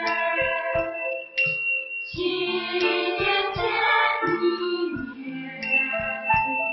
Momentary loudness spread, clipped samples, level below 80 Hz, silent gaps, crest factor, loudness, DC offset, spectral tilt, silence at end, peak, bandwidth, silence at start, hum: 9 LU; under 0.1%; -52 dBFS; none; 16 dB; -23 LUFS; under 0.1%; -6 dB/octave; 0 s; -8 dBFS; 6 kHz; 0 s; none